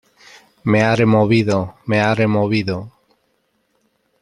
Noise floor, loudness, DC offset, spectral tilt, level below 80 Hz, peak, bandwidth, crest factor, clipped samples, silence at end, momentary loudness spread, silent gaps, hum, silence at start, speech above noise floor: -65 dBFS; -17 LUFS; under 0.1%; -7 dB/octave; -52 dBFS; -2 dBFS; 10.5 kHz; 16 dB; under 0.1%; 1.35 s; 10 LU; none; none; 0.65 s; 50 dB